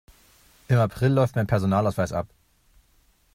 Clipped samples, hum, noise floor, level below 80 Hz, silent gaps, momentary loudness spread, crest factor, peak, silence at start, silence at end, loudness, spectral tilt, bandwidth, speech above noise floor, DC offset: under 0.1%; none; -62 dBFS; -52 dBFS; none; 8 LU; 16 dB; -8 dBFS; 0.7 s; 1.1 s; -23 LUFS; -8 dB/octave; 15.5 kHz; 40 dB; under 0.1%